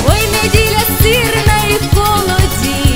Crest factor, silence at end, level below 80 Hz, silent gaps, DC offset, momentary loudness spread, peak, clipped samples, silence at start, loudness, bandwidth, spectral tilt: 12 dB; 0 s; -18 dBFS; none; 3%; 3 LU; 0 dBFS; 0.4%; 0 s; -11 LUFS; 16.5 kHz; -4 dB/octave